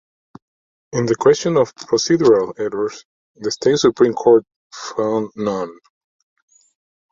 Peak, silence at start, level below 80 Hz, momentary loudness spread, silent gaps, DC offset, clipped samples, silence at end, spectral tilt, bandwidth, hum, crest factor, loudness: -2 dBFS; 0.95 s; -58 dBFS; 12 LU; 3.05-3.35 s, 4.56-4.70 s; under 0.1%; under 0.1%; 1.4 s; -5 dB/octave; 7.6 kHz; none; 16 dB; -17 LUFS